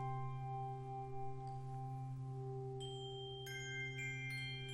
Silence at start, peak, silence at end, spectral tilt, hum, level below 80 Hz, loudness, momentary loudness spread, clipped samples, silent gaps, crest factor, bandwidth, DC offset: 0 s; -34 dBFS; 0 s; -5 dB/octave; none; -66 dBFS; -46 LUFS; 4 LU; under 0.1%; none; 12 dB; 13 kHz; under 0.1%